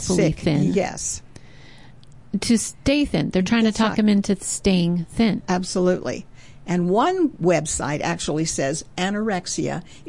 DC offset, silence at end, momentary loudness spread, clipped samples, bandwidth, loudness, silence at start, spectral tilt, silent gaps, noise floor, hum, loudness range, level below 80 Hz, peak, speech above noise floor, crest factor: 0.5%; 0.1 s; 7 LU; under 0.1%; 11.5 kHz; -21 LUFS; 0 s; -5 dB/octave; none; -47 dBFS; none; 3 LU; -44 dBFS; -8 dBFS; 26 dB; 14 dB